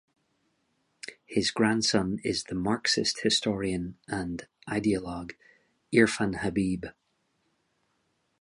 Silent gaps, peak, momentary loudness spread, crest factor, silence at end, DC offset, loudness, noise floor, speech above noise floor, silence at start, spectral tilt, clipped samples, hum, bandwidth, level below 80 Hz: none; -8 dBFS; 16 LU; 22 dB; 1.5 s; under 0.1%; -28 LUFS; -74 dBFS; 46 dB; 1.05 s; -4 dB/octave; under 0.1%; none; 11.5 kHz; -54 dBFS